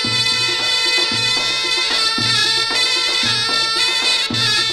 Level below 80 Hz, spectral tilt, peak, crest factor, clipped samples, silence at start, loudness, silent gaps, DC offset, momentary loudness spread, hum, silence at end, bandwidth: -52 dBFS; -1 dB/octave; -2 dBFS; 14 dB; under 0.1%; 0 s; -14 LUFS; none; under 0.1%; 1 LU; none; 0 s; 16 kHz